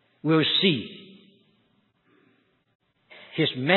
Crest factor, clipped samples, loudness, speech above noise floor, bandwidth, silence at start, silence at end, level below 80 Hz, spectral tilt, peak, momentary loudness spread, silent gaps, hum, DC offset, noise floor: 24 dB; under 0.1%; -23 LUFS; 45 dB; 4.3 kHz; 0.25 s; 0 s; -72 dBFS; -9.5 dB/octave; -2 dBFS; 19 LU; 2.75-2.80 s; none; under 0.1%; -67 dBFS